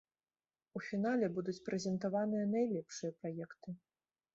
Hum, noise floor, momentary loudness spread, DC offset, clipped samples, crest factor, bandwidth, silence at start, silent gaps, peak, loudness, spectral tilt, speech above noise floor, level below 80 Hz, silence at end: none; under -90 dBFS; 14 LU; under 0.1%; under 0.1%; 16 dB; 8 kHz; 0.75 s; none; -24 dBFS; -38 LUFS; -6.5 dB/octave; over 52 dB; -80 dBFS; 0.6 s